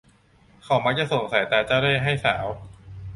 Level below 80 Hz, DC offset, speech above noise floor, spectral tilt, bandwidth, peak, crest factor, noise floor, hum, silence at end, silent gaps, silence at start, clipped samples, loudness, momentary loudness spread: -50 dBFS; under 0.1%; 34 dB; -5.5 dB/octave; 11.5 kHz; -6 dBFS; 20 dB; -57 dBFS; none; 0 s; none; 0.65 s; under 0.1%; -22 LUFS; 16 LU